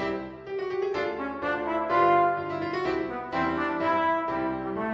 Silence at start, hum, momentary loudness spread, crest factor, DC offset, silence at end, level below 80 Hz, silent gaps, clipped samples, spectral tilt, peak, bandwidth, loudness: 0 s; none; 9 LU; 18 dB; under 0.1%; 0 s; -56 dBFS; none; under 0.1%; -7 dB/octave; -10 dBFS; 7.6 kHz; -27 LUFS